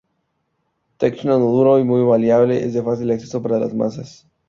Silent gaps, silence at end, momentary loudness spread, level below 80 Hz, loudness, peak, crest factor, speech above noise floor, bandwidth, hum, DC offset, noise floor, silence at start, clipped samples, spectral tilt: none; 0.4 s; 8 LU; -58 dBFS; -17 LUFS; -2 dBFS; 16 dB; 53 dB; 7.4 kHz; none; under 0.1%; -70 dBFS; 1 s; under 0.1%; -8.5 dB/octave